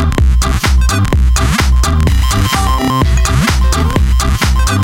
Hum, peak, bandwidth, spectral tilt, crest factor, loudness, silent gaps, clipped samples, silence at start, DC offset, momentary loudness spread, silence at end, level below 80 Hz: none; -2 dBFS; 16.5 kHz; -4.5 dB/octave; 8 dB; -12 LUFS; none; under 0.1%; 0 s; under 0.1%; 1 LU; 0 s; -12 dBFS